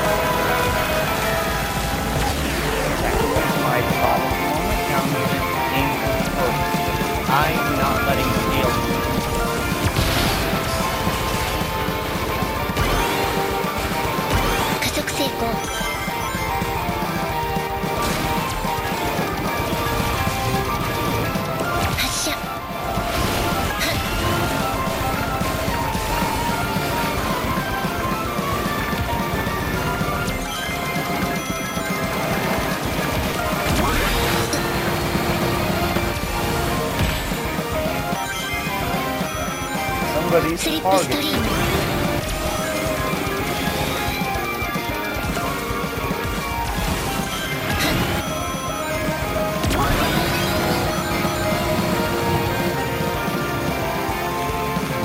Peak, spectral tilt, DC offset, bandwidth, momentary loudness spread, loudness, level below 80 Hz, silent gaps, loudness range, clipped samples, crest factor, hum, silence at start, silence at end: -4 dBFS; -4.5 dB/octave; under 0.1%; 16 kHz; 4 LU; -21 LUFS; -32 dBFS; none; 3 LU; under 0.1%; 18 dB; none; 0 s; 0 s